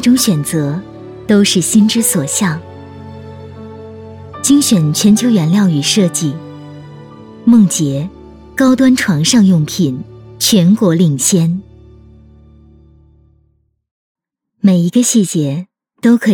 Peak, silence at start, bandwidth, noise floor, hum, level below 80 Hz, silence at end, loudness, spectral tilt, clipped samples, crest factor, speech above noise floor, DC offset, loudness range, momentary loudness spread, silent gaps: 0 dBFS; 0 s; 18 kHz; -58 dBFS; none; -48 dBFS; 0 s; -12 LUFS; -4.5 dB/octave; under 0.1%; 12 dB; 47 dB; under 0.1%; 5 LU; 22 LU; 13.91-14.15 s